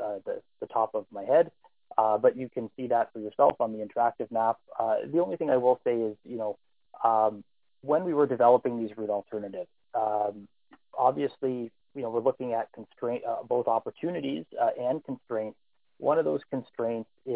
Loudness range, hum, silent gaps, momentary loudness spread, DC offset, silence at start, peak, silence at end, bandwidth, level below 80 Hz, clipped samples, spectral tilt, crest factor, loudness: 4 LU; none; none; 12 LU; under 0.1%; 0 s; -8 dBFS; 0 s; 4 kHz; -72 dBFS; under 0.1%; -10 dB/octave; 20 dB; -29 LUFS